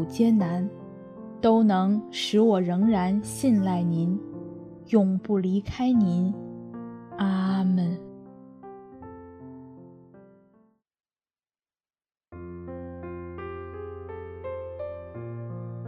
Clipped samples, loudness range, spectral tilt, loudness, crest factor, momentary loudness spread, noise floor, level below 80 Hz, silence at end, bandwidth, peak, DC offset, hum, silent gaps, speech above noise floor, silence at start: under 0.1%; 20 LU; -7 dB/octave; -25 LUFS; 20 dB; 23 LU; under -90 dBFS; -60 dBFS; 0 s; 13.5 kHz; -8 dBFS; under 0.1%; none; none; over 67 dB; 0 s